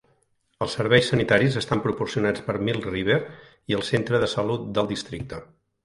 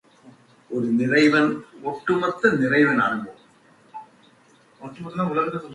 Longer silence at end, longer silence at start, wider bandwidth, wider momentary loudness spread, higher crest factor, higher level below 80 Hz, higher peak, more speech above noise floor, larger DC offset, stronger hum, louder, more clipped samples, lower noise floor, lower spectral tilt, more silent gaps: first, 0.4 s vs 0 s; first, 0.6 s vs 0.25 s; about the same, 11.5 kHz vs 11 kHz; second, 14 LU vs 24 LU; about the same, 22 dB vs 18 dB; first, -50 dBFS vs -64 dBFS; first, -2 dBFS vs -6 dBFS; first, 44 dB vs 35 dB; neither; neither; second, -24 LUFS vs -21 LUFS; neither; first, -67 dBFS vs -56 dBFS; about the same, -5.5 dB/octave vs -6.5 dB/octave; neither